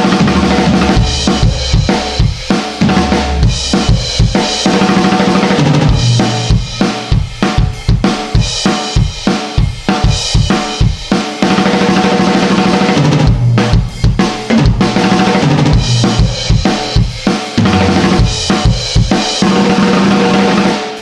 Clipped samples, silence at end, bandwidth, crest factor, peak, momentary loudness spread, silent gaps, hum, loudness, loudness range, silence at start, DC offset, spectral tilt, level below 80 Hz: under 0.1%; 0 s; 11.5 kHz; 10 dB; 0 dBFS; 4 LU; none; none; -11 LUFS; 3 LU; 0 s; under 0.1%; -5.5 dB/octave; -20 dBFS